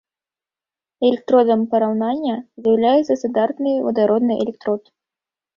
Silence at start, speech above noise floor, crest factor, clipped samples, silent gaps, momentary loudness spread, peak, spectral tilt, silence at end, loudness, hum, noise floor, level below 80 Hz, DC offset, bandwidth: 1 s; over 72 dB; 16 dB; under 0.1%; none; 8 LU; -4 dBFS; -7 dB/octave; 0.8 s; -18 LUFS; none; under -90 dBFS; -64 dBFS; under 0.1%; 7.2 kHz